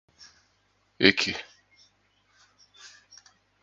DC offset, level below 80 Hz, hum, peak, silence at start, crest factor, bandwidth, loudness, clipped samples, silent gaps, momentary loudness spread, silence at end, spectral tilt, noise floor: under 0.1%; -64 dBFS; 50 Hz at -60 dBFS; 0 dBFS; 1 s; 32 dB; 8.8 kHz; -23 LUFS; under 0.1%; none; 28 LU; 0.75 s; -3.5 dB/octave; -69 dBFS